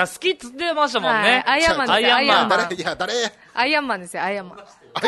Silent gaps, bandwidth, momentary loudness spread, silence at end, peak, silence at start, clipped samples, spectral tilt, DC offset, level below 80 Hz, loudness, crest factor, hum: none; 12.5 kHz; 10 LU; 0 s; -2 dBFS; 0 s; under 0.1%; -2.5 dB/octave; under 0.1%; -52 dBFS; -19 LUFS; 18 dB; none